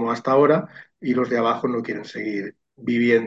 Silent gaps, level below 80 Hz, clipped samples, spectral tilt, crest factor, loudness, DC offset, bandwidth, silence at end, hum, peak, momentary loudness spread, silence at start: none; -70 dBFS; under 0.1%; -7 dB/octave; 18 dB; -22 LUFS; under 0.1%; 7.6 kHz; 0 s; none; -4 dBFS; 14 LU; 0 s